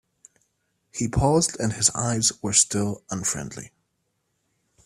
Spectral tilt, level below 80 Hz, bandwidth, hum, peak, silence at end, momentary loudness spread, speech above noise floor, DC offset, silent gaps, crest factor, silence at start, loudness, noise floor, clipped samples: -3.5 dB/octave; -46 dBFS; 15 kHz; none; -2 dBFS; 1.2 s; 13 LU; 51 dB; under 0.1%; none; 24 dB; 0.95 s; -22 LUFS; -74 dBFS; under 0.1%